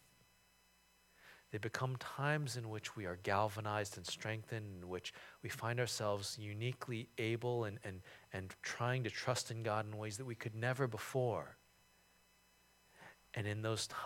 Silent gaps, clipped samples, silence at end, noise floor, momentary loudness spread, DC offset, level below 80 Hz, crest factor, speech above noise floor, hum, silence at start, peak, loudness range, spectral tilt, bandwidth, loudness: none; under 0.1%; 0 s; -72 dBFS; 12 LU; under 0.1%; -76 dBFS; 24 dB; 30 dB; none; 1.2 s; -20 dBFS; 3 LU; -4.5 dB/octave; 17 kHz; -42 LUFS